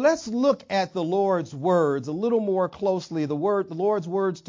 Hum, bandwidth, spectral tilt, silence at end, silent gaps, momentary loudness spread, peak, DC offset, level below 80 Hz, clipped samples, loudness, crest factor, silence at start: none; 7.6 kHz; -6.5 dB/octave; 0.1 s; none; 4 LU; -8 dBFS; under 0.1%; -66 dBFS; under 0.1%; -24 LUFS; 14 dB; 0 s